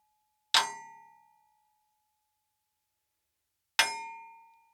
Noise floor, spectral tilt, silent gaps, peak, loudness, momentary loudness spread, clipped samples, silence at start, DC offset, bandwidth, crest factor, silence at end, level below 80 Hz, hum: -83 dBFS; 2 dB/octave; none; -8 dBFS; -29 LUFS; 20 LU; under 0.1%; 0.55 s; under 0.1%; over 20 kHz; 30 dB; 0.4 s; under -90 dBFS; none